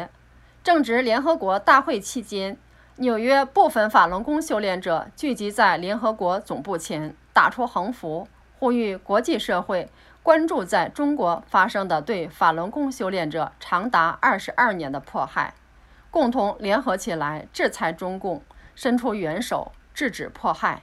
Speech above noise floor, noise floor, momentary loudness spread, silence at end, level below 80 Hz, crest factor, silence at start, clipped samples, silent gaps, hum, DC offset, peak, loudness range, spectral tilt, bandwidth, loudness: 30 dB; -52 dBFS; 11 LU; 0.05 s; -54 dBFS; 22 dB; 0 s; under 0.1%; none; none; under 0.1%; -2 dBFS; 5 LU; -4.5 dB/octave; 15 kHz; -23 LUFS